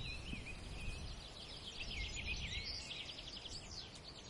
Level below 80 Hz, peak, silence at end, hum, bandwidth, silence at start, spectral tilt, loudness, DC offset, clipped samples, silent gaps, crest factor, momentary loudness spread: -52 dBFS; -32 dBFS; 0 s; none; 11.5 kHz; 0 s; -3 dB/octave; -46 LUFS; under 0.1%; under 0.1%; none; 16 dB; 7 LU